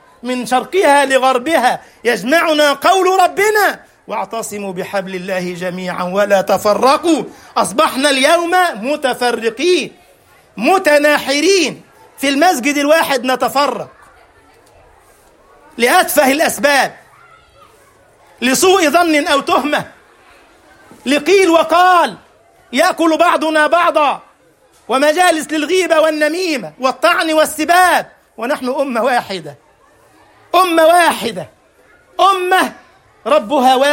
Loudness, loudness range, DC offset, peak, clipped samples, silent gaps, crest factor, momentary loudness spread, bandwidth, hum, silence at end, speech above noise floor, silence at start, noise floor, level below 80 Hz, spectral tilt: -13 LUFS; 3 LU; under 0.1%; 0 dBFS; under 0.1%; none; 14 dB; 11 LU; 16.5 kHz; none; 0 s; 38 dB; 0.25 s; -50 dBFS; -58 dBFS; -2.5 dB/octave